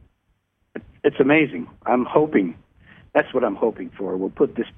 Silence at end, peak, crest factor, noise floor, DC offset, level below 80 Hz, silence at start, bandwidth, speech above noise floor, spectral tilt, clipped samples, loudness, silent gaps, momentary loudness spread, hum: 0.1 s; -2 dBFS; 20 dB; -69 dBFS; under 0.1%; -58 dBFS; 0.75 s; 3.8 kHz; 48 dB; -9.5 dB/octave; under 0.1%; -21 LUFS; none; 14 LU; none